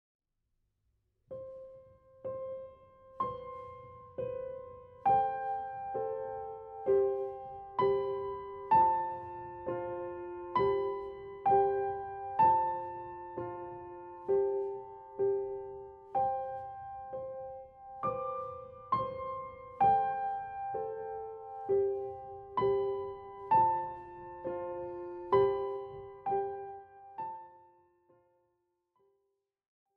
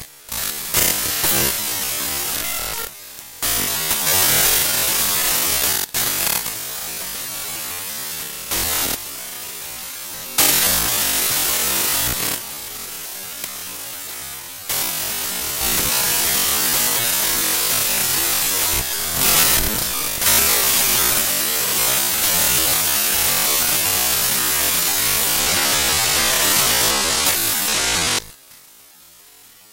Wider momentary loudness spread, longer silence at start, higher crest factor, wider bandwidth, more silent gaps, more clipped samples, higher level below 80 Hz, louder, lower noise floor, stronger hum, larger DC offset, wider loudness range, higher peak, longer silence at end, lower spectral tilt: first, 18 LU vs 14 LU; first, 1.3 s vs 0 s; about the same, 20 dB vs 18 dB; second, 4.6 kHz vs 16.5 kHz; neither; neither; second, -66 dBFS vs -42 dBFS; second, -34 LUFS vs -16 LUFS; first, -82 dBFS vs -46 dBFS; neither; neither; first, 11 LU vs 7 LU; second, -16 dBFS vs -2 dBFS; first, 2.35 s vs 1.15 s; first, -9 dB/octave vs 0 dB/octave